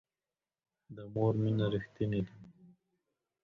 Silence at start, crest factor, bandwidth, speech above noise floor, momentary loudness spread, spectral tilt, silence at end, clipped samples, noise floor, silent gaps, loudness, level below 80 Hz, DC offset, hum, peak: 0.9 s; 18 dB; 4.6 kHz; over 57 dB; 15 LU; -9.5 dB/octave; 0.8 s; under 0.1%; under -90 dBFS; none; -34 LUFS; -62 dBFS; under 0.1%; none; -20 dBFS